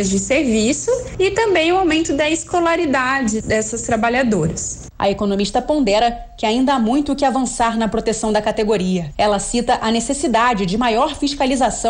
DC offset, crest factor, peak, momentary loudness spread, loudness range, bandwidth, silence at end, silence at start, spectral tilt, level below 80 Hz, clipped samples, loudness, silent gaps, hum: under 0.1%; 10 dB; -6 dBFS; 4 LU; 1 LU; 10.5 kHz; 0 s; 0 s; -4 dB/octave; -38 dBFS; under 0.1%; -17 LUFS; none; none